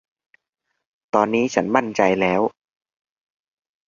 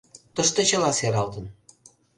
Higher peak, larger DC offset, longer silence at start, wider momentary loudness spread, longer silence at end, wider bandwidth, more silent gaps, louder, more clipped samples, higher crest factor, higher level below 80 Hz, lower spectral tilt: first, -2 dBFS vs -6 dBFS; neither; first, 1.15 s vs 0.35 s; second, 5 LU vs 17 LU; first, 1.4 s vs 0.65 s; second, 7.4 kHz vs 11.5 kHz; neither; first, -20 LUFS vs -23 LUFS; neither; about the same, 22 dB vs 20 dB; about the same, -60 dBFS vs -56 dBFS; first, -5.5 dB/octave vs -3 dB/octave